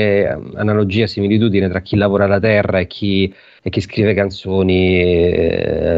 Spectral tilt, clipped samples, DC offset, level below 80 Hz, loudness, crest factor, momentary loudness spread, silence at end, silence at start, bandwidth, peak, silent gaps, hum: -8 dB/octave; under 0.1%; under 0.1%; -38 dBFS; -15 LUFS; 12 dB; 7 LU; 0 s; 0 s; 7.8 kHz; -2 dBFS; none; none